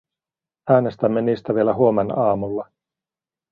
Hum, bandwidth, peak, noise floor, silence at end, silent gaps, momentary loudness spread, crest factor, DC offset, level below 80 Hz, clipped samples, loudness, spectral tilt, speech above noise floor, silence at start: none; 5.2 kHz; -2 dBFS; under -90 dBFS; 0.9 s; none; 12 LU; 18 dB; under 0.1%; -56 dBFS; under 0.1%; -20 LUFS; -10.5 dB/octave; over 71 dB; 0.65 s